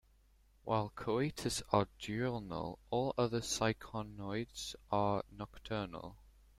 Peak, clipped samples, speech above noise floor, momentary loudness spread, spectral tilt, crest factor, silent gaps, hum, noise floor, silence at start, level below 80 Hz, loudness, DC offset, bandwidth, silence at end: -14 dBFS; under 0.1%; 30 dB; 10 LU; -5 dB/octave; 24 dB; none; none; -68 dBFS; 0.65 s; -60 dBFS; -38 LUFS; under 0.1%; 15 kHz; 0.3 s